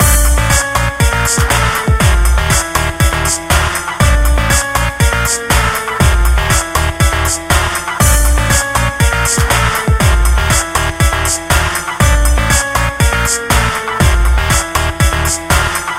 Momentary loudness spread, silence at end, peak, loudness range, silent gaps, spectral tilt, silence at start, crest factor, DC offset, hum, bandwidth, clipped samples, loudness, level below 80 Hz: 3 LU; 0 s; 0 dBFS; 1 LU; none; -3.5 dB/octave; 0 s; 12 dB; under 0.1%; none; 16.5 kHz; under 0.1%; -12 LUFS; -16 dBFS